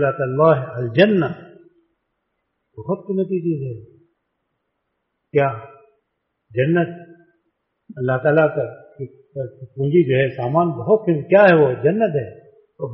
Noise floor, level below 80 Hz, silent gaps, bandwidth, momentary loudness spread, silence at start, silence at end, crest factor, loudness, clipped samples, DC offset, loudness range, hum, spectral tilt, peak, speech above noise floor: -74 dBFS; -60 dBFS; none; 5.8 kHz; 18 LU; 0 s; 0 s; 18 dB; -18 LUFS; under 0.1%; under 0.1%; 11 LU; none; -6 dB/octave; -2 dBFS; 57 dB